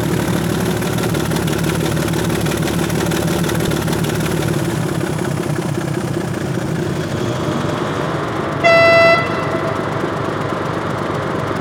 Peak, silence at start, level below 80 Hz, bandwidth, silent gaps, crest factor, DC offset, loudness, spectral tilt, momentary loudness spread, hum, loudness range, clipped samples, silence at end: -2 dBFS; 0 s; -38 dBFS; over 20 kHz; none; 16 dB; under 0.1%; -17 LUFS; -5.5 dB/octave; 8 LU; none; 5 LU; under 0.1%; 0 s